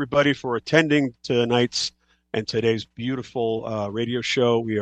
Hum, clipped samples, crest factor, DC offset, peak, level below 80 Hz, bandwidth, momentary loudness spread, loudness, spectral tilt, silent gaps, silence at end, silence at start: none; under 0.1%; 22 dB; under 0.1%; -2 dBFS; -60 dBFS; 9 kHz; 9 LU; -23 LUFS; -5 dB/octave; none; 0 s; 0 s